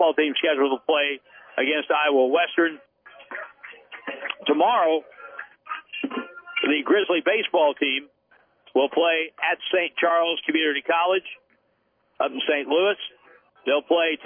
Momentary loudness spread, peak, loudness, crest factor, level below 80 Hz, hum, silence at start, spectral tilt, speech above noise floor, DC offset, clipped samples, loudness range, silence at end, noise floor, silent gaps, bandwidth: 17 LU; -8 dBFS; -22 LUFS; 16 dB; -82 dBFS; none; 0 s; -6.5 dB/octave; 46 dB; under 0.1%; under 0.1%; 3 LU; 0 s; -68 dBFS; none; 3.6 kHz